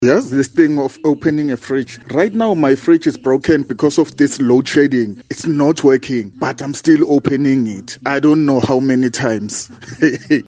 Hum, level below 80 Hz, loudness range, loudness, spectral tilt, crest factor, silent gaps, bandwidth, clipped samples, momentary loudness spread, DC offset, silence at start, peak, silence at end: none; -54 dBFS; 1 LU; -15 LUFS; -6 dB/octave; 14 dB; none; 9.6 kHz; under 0.1%; 9 LU; under 0.1%; 0 s; 0 dBFS; 0.05 s